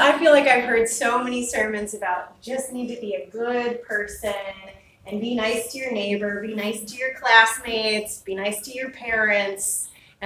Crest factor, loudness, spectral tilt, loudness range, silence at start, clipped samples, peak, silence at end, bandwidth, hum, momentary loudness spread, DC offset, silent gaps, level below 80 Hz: 22 dB; -22 LUFS; -2 dB/octave; 7 LU; 0 s; under 0.1%; 0 dBFS; 0 s; 16 kHz; none; 15 LU; under 0.1%; none; -56 dBFS